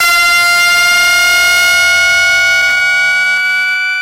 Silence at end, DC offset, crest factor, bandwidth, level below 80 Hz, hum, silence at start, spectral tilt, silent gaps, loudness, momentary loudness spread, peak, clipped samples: 0 s; under 0.1%; 8 dB; 16 kHz; -44 dBFS; none; 0 s; 2 dB/octave; none; -7 LUFS; 3 LU; -2 dBFS; under 0.1%